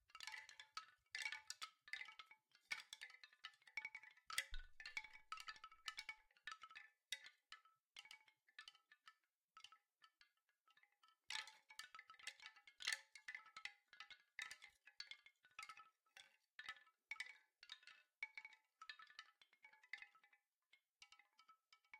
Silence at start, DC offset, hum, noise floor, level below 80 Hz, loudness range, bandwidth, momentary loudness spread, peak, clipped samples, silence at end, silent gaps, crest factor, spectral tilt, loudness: 0.1 s; under 0.1%; none; -83 dBFS; -74 dBFS; 8 LU; 15 kHz; 16 LU; -26 dBFS; under 0.1%; 0 s; 7.86-7.91 s, 9.37-9.48 s, 10.61-10.65 s, 16.55-16.59 s, 18.18-18.22 s, 20.89-20.95 s; 32 dB; 2 dB/octave; -55 LUFS